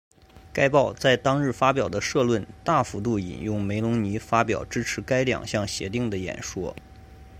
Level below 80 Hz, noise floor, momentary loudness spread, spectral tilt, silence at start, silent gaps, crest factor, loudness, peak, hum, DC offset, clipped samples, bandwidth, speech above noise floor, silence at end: -48 dBFS; -46 dBFS; 10 LU; -5 dB/octave; 0.35 s; none; 20 dB; -25 LUFS; -4 dBFS; none; under 0.1%; under 0.1%; 15.5 kHz; 22 dB; 0 s